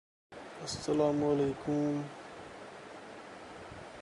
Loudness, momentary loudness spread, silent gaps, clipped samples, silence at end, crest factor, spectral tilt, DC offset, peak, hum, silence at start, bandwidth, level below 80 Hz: -33 LUFS; 18 LU; none; under 0.1%; 0 s; 18 dB; -6 dB/octave; under 0.1%; -18 dBFS; none; 0.3 s; 11.5 kHz; -64 dBFS